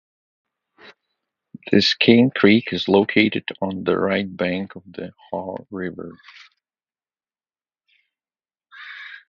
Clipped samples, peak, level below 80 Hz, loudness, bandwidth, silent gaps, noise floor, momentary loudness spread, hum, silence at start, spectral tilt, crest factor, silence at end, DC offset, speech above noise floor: under 0.1%; 0 dBFS; -58 dBFS; -19 LUFS; 7.2 kHz; none; under -90 dBFS; 21 LU; none; 0.85 s; -6 dB/octave; 22 dB; 0.1 s; under 0.1%; over 70 dB